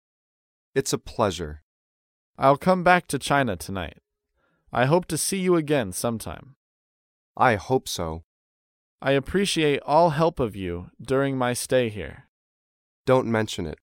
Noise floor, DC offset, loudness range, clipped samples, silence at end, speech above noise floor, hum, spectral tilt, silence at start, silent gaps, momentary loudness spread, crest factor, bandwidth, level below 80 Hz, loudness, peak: -72 dBFS; under 0.1%; 3 LU; under 0.1%; 0.1 s; 49 dB; none; -5 dB/octave; 0.75 s; 1.63-2.34 s, 6.56-7.35 s, 8.24-8.99 s, 12.29-13.05 s; 14 LU; 22 dB; 17 kHz; -50 dBFS; -24 LUFS; -4 dBFS